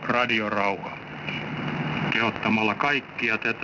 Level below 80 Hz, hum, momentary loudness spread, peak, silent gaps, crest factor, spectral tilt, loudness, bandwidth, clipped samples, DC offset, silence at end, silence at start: -60 dBFS; none; 9 LU; -10 dBFS; none; 16 dB; -6 dB/octave; -25 LUFS; 6 kHz; under 0.1%; under 0.1%; 0 s; 0 s